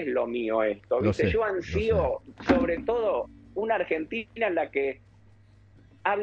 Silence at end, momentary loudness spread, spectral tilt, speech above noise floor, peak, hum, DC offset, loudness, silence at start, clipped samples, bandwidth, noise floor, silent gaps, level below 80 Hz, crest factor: 0 s; 8 LU; -7.5 dB/octave; 29 dB; -6 dBFS; none; under 0.1%; -27 LUFS; 0 s; under 0.1%; 8.2 kHz; -56 dBFS; none; -46 dBFS; 22 dB